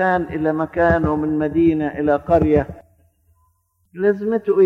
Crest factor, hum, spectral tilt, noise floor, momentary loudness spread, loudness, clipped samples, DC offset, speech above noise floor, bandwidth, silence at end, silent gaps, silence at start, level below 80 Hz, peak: 14 dB; none; -9.5 dB/octave; -63 dBFS; 5 LU; -18 LUFS; under 0.1%; under 0.1%; 46 dB; 5.4 kHz; 0 s; none; 0 s; -38 dBFS; -4 dBFS